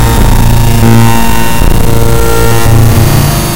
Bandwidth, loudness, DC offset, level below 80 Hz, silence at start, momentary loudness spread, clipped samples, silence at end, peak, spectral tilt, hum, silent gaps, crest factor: 17.5 kHz; -7 LUFS; under 0.1%; -10 dBFS; 0 s; 4 LU; 9%; 0 s; 0 dBFS; -5.5 dB/octave; none; none; 6 dB